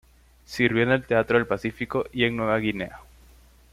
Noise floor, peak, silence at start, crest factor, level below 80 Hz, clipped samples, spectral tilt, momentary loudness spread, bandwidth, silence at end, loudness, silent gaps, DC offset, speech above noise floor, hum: -53 dBFS; -6 dBFS; 0.5 s; 20 dB; -52 dBFS; under 0.1%; -6.5 dB/octave; 9 LU; 15.5 kHz; 0.75 s; -24 LUFS; none; under 0.1%; 29 dB; none